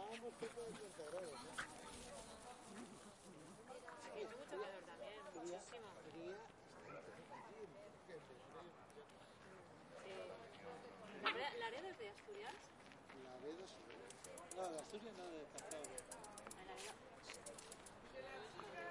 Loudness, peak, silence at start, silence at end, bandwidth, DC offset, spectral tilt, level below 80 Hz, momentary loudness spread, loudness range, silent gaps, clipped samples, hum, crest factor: -54 LUFS; -26 dBFS; 0 s; 0 s; 11.5 kHz; under 0.1%; -3 dB/octave; -78 dBFS; 11 LU; 8 LU; none; under 0.1%; none; 28 dB